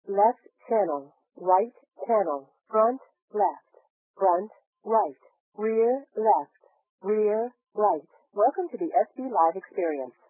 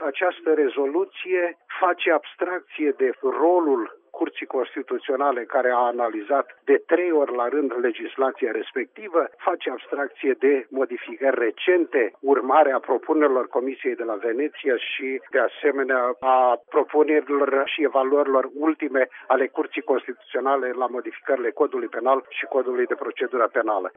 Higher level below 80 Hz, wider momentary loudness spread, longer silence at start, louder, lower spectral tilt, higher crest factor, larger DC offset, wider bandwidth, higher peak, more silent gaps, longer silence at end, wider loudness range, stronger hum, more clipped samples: about the same, under -90 dBFS vs -88 dBFS; first, 11 LU vs 8 LU; about the same, 0.05 s vs 0 s; second, -26 LUFS vs -23 LUFS; first, -12 dB/octave vs 0 dB/octave; about the same, 18 dB vs 18 dB; neither; second, 2.6 kHz vs 3.8 kHz; second, -8 dBFS vs -4 dBFS; first, 3.22-3.28 s, 3.90-4.14 s, 4.67-4.73 s, 5.40-5.52 s, 6.89-6.98 s vs none; first, 0.2 s vs 0.05 s; about the same, 2 LU vs 4 LU; neither; neither